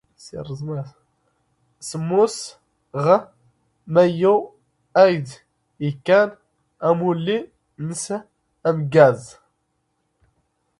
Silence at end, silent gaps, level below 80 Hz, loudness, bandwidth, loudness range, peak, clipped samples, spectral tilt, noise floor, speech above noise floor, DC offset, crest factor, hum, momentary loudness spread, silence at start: 1.5 s; none; -62 dBFS; -20 LUFS; 11.5 kHz; 4 LU; 0 dBFS; under 0.1%; -6 dB/octave; -71 dBFS; 52 dB; under 0.1%; 20 dB; none; 19 LU; 0.25 s